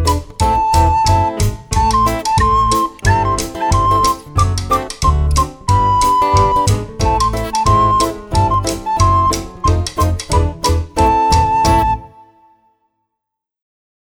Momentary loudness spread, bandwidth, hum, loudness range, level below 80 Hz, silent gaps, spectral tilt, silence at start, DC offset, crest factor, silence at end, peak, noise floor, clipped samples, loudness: 5 LU; 19.5 kHz; none; 2 LU; -22 dBFS; none; -5 dB/octave; 0 s; under 0.1%; 14 dB; 2.05 s; 0 dBFS; -79 dBFS; under 0.1%; -14 LUFS